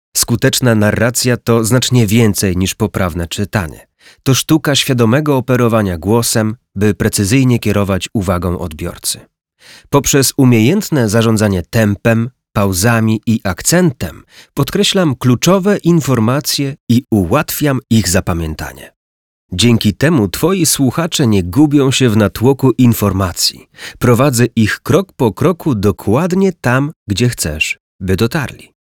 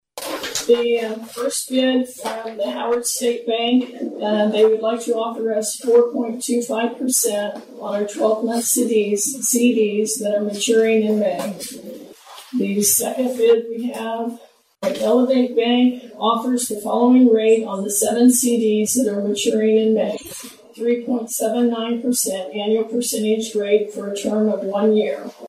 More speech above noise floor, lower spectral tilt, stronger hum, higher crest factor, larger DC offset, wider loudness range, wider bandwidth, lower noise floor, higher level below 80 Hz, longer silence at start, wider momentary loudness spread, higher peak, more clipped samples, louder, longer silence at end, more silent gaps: first, over 77 dB vs 22 dB; first, -5 dB/octave vs -3.5 dB/octave; neither; about the same, 12 dB vs 14 dB; neither; about the same, 3 LU vs 4 LU; first, 19.5 kHz vs 15.5 kHz; first, under -90 dBFS vs -41 dBFS; first, -38 dBFS vs -66 dBFS; about the same, 0.15 s vs 0.15 s; about the same, 8 LU vs 10 LU; first, 0 dBFS vs -4 dBFS; neither; first, -13 LUFS vs -19 LUFS; first, 0.4 s vs 0 s; first, 16.80-16.87 s, 18.96-19.49 s, 26.96-27.06 s, 27.80-27.99 s vs none